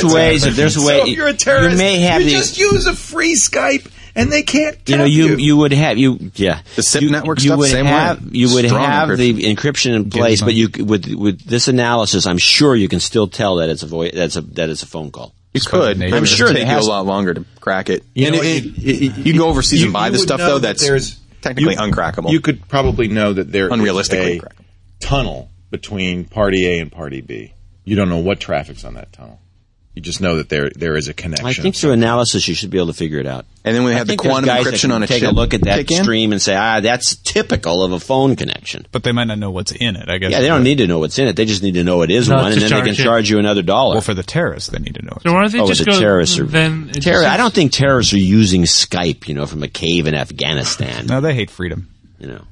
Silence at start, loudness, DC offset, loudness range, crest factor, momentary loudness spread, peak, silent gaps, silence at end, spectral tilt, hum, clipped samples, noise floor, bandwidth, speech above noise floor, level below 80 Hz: 0 s; -14 LUFS; under 0.1%; 6 LU; 14 dB; 10 LU; 0 dBFS; none; 0.1 s; -4.5 dB/octave; none; under 0.1%; -50 dBFS; 11.5 kHz; 36 dB; -34 dBFS